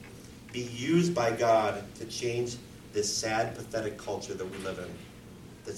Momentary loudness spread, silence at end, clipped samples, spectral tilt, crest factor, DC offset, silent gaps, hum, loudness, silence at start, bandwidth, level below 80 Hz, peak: 21 LU; 0 s; under 0.1%; -4.5 dB/octave; 18 dB; under 0.1%; none; none; -31 LUFS; 0 s; 16.5 kHz; -58 dBFS; -14 dBFS